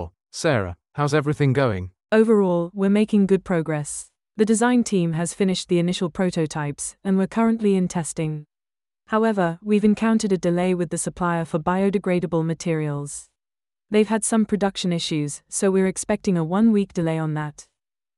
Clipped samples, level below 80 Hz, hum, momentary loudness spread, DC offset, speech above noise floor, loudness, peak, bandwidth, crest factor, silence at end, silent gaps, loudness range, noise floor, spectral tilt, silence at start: under 0.1%; -54 dBFS; none; 9 LU; under 0.1%; over 69 dB; -22 LUFS; -6 dBFS; 12 kHz; 16 dB; 0.55 s; none; 3 LU; under -90 dBFS; -6 dB/octave; 0 s